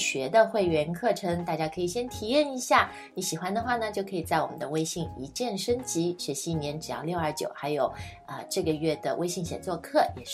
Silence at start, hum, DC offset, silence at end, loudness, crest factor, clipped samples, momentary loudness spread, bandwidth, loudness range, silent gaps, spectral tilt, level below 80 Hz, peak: 0 s; none; under 0.1%; 0 s; -29 LUFS; 22 dB; under 0.1%; 9 LU; 16 kHz; 4 LU; none; -4 dB/octave; -56 dBFS; -8 dBFS